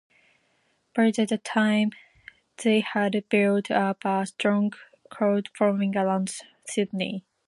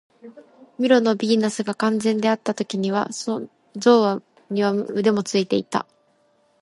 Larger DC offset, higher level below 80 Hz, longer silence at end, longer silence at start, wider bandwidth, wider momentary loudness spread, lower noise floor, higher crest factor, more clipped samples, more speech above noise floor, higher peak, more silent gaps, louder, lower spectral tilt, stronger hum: neither; about the same, -74 dBFS vs -72 dBFS; second, 0.3 s vs 0.8 s; first, 0.95 s vs 0.25 s; about the same, 11.5 kHz vs 11.5 kHz; second, 7 LU vs 11 LU; first, -69 dBFS vs -62 dBFS; about the same, 18 dB vs 18 dB; neither; about the same, 45 dB vs 42 dB; second, -8 dBFS vs -4 dBFS; neither; second, -25 LUFS vs -21 LUFS; about the same, -5.5 dB/octave vs -5 dB/octave; neither